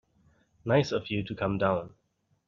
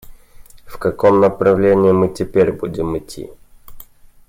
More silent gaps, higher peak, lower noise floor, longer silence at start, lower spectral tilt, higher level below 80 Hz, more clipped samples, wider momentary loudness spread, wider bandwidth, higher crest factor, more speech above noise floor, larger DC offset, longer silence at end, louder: neither; second, -10 dBFS vs -2 dBFS; first, -66 dBFS vs -40 dBFS; first, 0.65 s vs 0.1 s; second, -5.5 dB/octave vs -7.5 dB/octave; second, -58 dBFS vs -42 dBFS; neither; second, 11 LU vs 15 LU; second, 7.4 kHz vs 16 kHz; first, 20 dB vs 14 dB; first, 38 dB vs 25 dB; neither; first, 0.6 s vs 0.45 s; second, -29 LUFS vs -15 LUFS